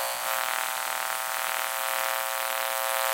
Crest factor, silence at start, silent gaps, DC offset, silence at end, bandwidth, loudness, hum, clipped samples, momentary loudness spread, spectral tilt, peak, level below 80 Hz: 20 dB; 0 s; none; under 0.1%; 0 s; 17 kHz; -27 LUFS; none; under 0.1%; 2 LU; 2 dB/octave; -8 dBFS; -76 dBFS